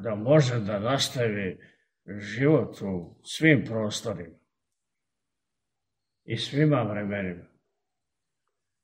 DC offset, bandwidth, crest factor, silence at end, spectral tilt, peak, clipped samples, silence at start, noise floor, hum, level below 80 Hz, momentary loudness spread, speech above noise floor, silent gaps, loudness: under 0.1%; 16 kHz; 24 dB; 1.4 s; -5.5 dB/octave; -4 dBFS; under 0.1%; 0 s; -86 dBFS; none; -66 dBFS; 16 LU; 60 dB; none; -26 LUFS